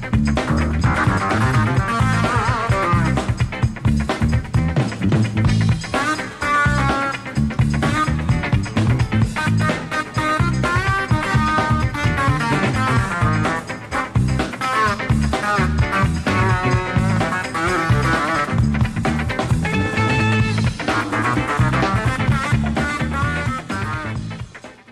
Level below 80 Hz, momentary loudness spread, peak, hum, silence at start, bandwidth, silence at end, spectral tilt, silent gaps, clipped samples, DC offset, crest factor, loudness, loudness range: -30 dBFS; 4 LU; -4 dBFS; none; 0 s; 12.5 kHz; 0 s; -6 dB/octave; none; under 0.1%; under 0.1%; 14 dB; -19 LUFS; 1 LU